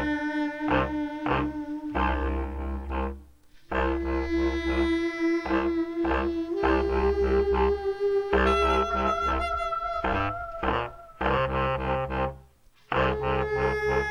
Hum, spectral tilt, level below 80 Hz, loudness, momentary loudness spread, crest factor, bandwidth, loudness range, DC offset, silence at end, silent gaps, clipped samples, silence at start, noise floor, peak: none; -7 dB/octave; -36 dBFS; -27 LUFS; 8 LU; 18 dB; 10 kHz; 5 LU; under 0.1%; 0 s; none; under 0.1%; 0 s; -57 dBFS; -8 dBFS